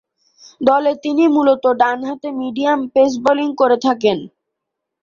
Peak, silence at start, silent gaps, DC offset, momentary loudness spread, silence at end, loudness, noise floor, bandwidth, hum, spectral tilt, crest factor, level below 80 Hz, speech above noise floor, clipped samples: -2 dBFS; 0.6 s; none; under 0.1%; 9 LU; 0.75 s; -16 LUFS; -79 dBFS; 7.2 kHz; none; -5 dB/octave; 14 dB; -60 dBFS; 64 dB; under 0.1%